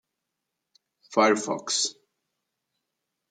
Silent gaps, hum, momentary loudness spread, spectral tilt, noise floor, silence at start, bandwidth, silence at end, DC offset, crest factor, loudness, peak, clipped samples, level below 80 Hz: none; none; 7 LU; -2 dB/octave; -84 dBFS; 1.1 s; 9.8 kHz; 1.4 s; under 0.1%; 24 dB; -25 LUFS; -6 dBFS; under 0.1%; -82 dBFS